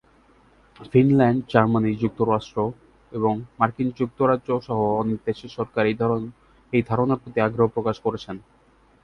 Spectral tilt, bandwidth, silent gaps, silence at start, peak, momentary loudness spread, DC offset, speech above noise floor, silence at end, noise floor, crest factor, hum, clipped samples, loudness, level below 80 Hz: -9 dB/octave; 6.8 kHz; none; 0.8 s; -2 dBFS; 10 LU; under 0.1%; 35 dB; 0.65 s; -57 dBFS; 22 dB; none; under 0.1%; -23 LUFS; -54 dBFS